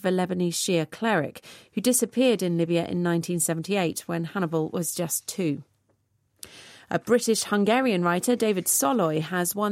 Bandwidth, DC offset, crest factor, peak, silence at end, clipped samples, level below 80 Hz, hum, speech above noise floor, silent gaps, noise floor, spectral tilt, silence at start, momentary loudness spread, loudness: 16 kHz; under 0.1%; 16 dB; -8 dBFS; 0 s; under 0.1%; -70 dBFS; none; 45 dB; none; -69 dBFS; -4.5 dB/octave; 0 s; 9 LU; -25 LUFS